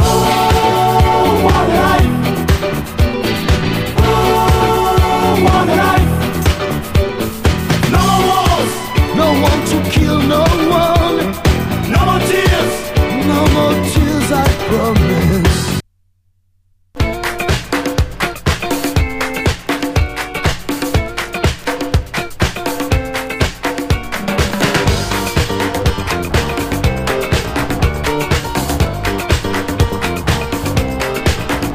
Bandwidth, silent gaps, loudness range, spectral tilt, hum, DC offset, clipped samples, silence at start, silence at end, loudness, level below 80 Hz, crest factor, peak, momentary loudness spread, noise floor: 15.5 kHz; none; 5 LU; -5.5 dB/octave; none; under 0.1%; under 0.1%; 0 s; 0 s; -14 LUFS; -22 dBFS; 14 dB; 0 dBFS; 7 LU; -57 dBFS